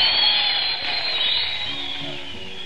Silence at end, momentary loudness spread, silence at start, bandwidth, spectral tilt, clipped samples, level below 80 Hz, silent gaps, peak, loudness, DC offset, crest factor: 0 s; 14 LU; 0 s; 11.5 kHz; -2 dB/octave; under 0.1%; -54 dBFS; none; -6 dBFS; -20 LUFS; 2%; 16 dB